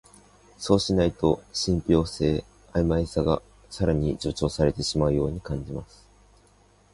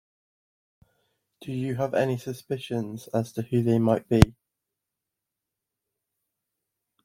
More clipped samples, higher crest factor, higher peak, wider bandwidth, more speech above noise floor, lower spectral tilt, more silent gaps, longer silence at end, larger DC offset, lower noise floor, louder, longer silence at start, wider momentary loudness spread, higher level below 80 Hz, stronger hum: neither; second, 20 dB vs 28 dB; second, -6 dBFS vs 0 dBFS; second, 11.5 kHz vs 16.5 kHz; second, 34 dB vs 61 dB; second, -6 dB/octave vs -7.5 dB/octave; neither; second, 1.1 s vs 2.75 s; neither; second, -58 dBFS vs -86 dBFS; about the same, -25 LUFS vs -26 LUFS; second, 0.6 s vs 1.4 s; about the same, 10 LU vs 12 LU; about the same, -40 dBFS vs -44 dBFS; first, 50 Hz at -50 dBFS vs none